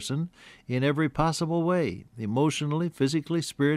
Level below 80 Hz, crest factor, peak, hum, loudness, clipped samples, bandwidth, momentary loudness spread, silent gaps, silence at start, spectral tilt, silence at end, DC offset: -52 dBFS; 14 dB; -12 dBFS; none; -27 LUFS; under 0.1%; 14 kHz; 7 LU; none; 0 s; -6 dB/octave; 0 s; under 0.1%